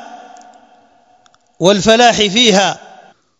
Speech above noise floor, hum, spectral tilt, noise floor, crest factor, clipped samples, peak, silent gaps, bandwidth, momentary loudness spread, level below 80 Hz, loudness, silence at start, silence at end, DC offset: 41 dB; none; -3 dB/octave; -52 dBFS; 14 dB; 0.1%; 0 dBFS; none; 12 kHz; 8 LU; -48 dBFS; -10 LUFS; 0 s; 0.65 s; under 0.1%